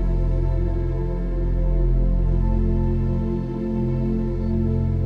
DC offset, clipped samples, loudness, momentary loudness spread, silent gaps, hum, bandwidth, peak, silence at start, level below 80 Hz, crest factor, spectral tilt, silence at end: under 0.1%; under 0.1%; -24 LUFS; 4 LU; none; none; 2.8 kHz; -10 dBFS; 0 s; -22 dBFS; 10 dB; -11 dB/octave; 0 s